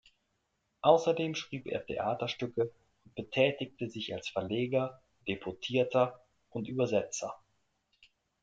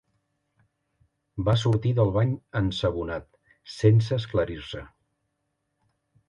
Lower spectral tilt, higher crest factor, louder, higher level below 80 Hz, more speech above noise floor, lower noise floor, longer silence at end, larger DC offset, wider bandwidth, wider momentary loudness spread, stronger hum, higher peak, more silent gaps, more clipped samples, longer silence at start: second, -5 dB/octave vs -7.5 dB/octave; about the same, 24 dB vs 20 dB; second, -33 LUFS vs -25 LUFS; second, -70 dBFS vs -46 dBFS; second, 48 dB vs 54 dB; about the same, -79 dBFS vs -78 dBFS; second, 1.05 s vs 1.45 s; neither; about the same, 8.6 kHz vs 9 kHz; second, 13 LU vs 16 LU; neither; about the same, -10 dBFS vs -8 dBFS; neither; neither; second, 0.85 s vs 1.35 s